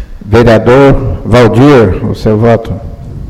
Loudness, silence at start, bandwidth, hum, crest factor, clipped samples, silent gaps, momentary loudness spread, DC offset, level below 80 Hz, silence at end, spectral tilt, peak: -6 LUFS; 0 s; 13 kHz; none; 6 dB; 4%; none; 10 LU; under 0.1%; -20 dBFS; 0 s; -8 dB/octave; 0 dBFS